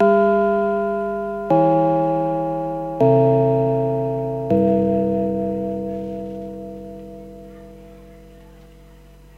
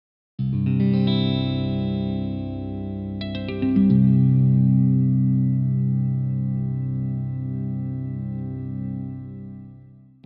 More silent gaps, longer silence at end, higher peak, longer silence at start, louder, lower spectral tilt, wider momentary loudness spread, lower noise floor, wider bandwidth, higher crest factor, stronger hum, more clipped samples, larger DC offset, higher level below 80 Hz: neither; first, 0.85 s vs 0.5 s; first, -4 dBFS vs -8 dBFS; second, 0 s vs 0.4 s; first, -19 LUFS vs -22 LUFS; about the same, -10 dB/octave vs -9 dB/octave; first, 19 LU vs 13 LU; about the same, -45 dBFS vs -47 dBFS; first, 7 kHz vs 4.9 kHz; about the same, 16 dB vs 14 dB; neither; neither; neither; about the same, -48 dBFS vs -48 dBFS